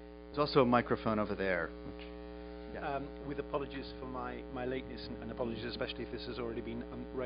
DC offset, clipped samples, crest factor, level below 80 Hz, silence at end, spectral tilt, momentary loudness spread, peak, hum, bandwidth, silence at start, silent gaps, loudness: under 0.1%; under 0.1%; 24 dB; -52 dBFS; 0 s; -4.5 dB/octave; 16 LU; -12 dBFS; none; 5.2 kHz; 0 s; none; -37 LUFS